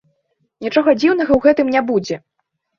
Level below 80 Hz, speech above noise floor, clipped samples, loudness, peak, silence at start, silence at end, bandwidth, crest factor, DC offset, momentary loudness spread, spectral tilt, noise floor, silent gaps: -48 dBFS; 52 dB; under 0.1%; -15 LUFS; -2 dBFS; 0.6 s; 0.6 s; 7.2 kHz; 16 dB; under 0.1%; 14 LU; -6 dB/octave; -67 dBFS; none